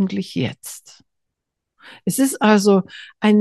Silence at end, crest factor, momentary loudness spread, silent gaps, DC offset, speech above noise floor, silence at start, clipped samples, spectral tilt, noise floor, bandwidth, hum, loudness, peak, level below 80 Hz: 0 s; 18 dB; 20 LU; none; under 0.1%; 62 dB; 0 s; under 0.1%; -5 dB/octave; -80 dBFS; 12.5 kHz; none; -18 LUFS; -2 dBFS; -66 dBFS